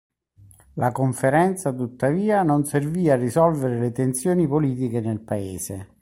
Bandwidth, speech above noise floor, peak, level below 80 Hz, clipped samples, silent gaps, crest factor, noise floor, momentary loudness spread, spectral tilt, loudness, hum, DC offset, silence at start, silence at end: 16.5 kHz; 31 dB; -6 dBFS; -56 dBFS; under 0.1%; none; 16 dB; -52 dBFS; 8 LU; -7 dB/octave; -22 LUFS; none; under 0.1%; 0.75 s; 0.15 s